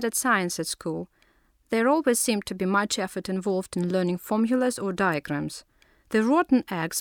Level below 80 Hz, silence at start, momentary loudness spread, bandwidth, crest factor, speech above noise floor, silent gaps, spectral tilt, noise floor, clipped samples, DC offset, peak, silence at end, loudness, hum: -62 dBFS; 0 s; 9 LU; 19.5 kHz; 16 dB; 39 dB; none; -4.5 dB/octave; -64 dBFS; under 0.1%; under 0.1%; -10 dBFS; 0 s; -25 LUFS; none